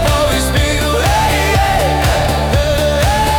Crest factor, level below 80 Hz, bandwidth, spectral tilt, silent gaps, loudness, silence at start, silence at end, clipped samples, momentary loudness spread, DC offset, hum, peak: 8 dB; -20 dBFS; over 20 kHz; -4.5 dB/octave; none; -13 LUFS; 0 s; 0 s; under 0.1%; 2 LU; under 0.1%; none; -4 dBFS